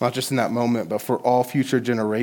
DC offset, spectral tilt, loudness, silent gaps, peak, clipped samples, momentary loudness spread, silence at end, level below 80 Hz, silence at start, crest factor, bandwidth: under 0.1%; -5.5 dB/octave; -22 LUFS; none; -6 dBFS; under 0.1%; 3 LU; 0 s; -70 dBFS; 0 s; 16 dB; 19 kHz